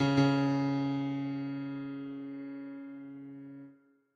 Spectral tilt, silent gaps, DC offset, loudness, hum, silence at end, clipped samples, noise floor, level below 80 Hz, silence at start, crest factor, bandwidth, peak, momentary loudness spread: -7.5 dB/octave; none; under 0.1%; -33 LUFS; none; 0.4 s; under 0.1%; -59 dBFS; -68 dBFS; 0 s; 20 dB; 7.4 kHz; -14 dBFS; 20 LU